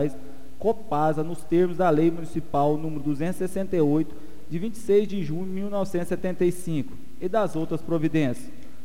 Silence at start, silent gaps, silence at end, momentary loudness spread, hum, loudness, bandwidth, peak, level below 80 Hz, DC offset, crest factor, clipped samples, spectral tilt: 0 s; none; 0.1 s; 10 LU; none; -26 LUFS; 16 kHz; -10 dBFS; -52 dBFS; 4%; 16 dB; under 0.1%; -7.5 dB/octave